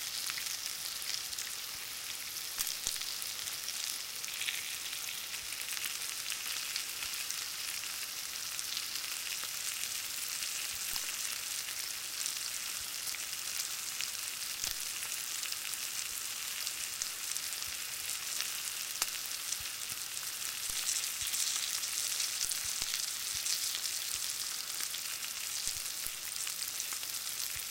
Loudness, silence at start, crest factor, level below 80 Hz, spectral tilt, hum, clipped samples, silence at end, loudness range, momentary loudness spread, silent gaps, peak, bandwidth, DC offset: -35 LUFS; 0 s; 28 dB; -68 dBFS; 2.5 dB/octave; none; under 0.1%; 0 s; 3 LU; 4 LU; none; -10 dBFS; 17 kHz; under 0.1%